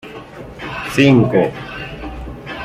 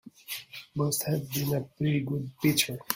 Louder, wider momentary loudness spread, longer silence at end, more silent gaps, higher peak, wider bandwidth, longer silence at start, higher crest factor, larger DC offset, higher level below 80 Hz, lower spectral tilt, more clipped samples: first, -14 LUFS vs -30 LUFS; first, 22 LU vs 13 LU; about the same, 0 s vs 0 s; neither; first, 0 dBFS vs -8 dBFS; second, 14.5 kHz vs 16.5 kHz; about the same, 0.05 s vs 0.05 s; second, 16 dB vs 22 dB; neither; first, -38 dBFS vs -62 dBFS; first, -7 dB/octave vs -4.5 dB/octave; neither